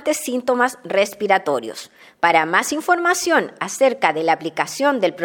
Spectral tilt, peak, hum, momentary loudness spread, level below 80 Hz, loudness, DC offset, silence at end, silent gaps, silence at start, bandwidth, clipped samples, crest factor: -3 dB/octave; 0 dBFS; none; 7 LU; -70 dBFS; -19 LUFS; under 0.1%; 0 s; none; 0 s; 17.5 kHz; under 0.1%; 18 dB